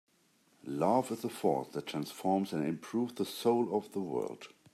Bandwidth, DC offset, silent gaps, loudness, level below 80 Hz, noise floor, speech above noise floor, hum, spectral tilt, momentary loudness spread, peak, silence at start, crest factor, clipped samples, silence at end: 15.5 kHz; under 0.1%; none; -34 LUFS; -80 dBFS; -70 dBFS; 36 dB; none; -6 dB/octave; 9 LU; -16 dBFS; 0.65 s; 20 dB; under 0.1%; 0.25 s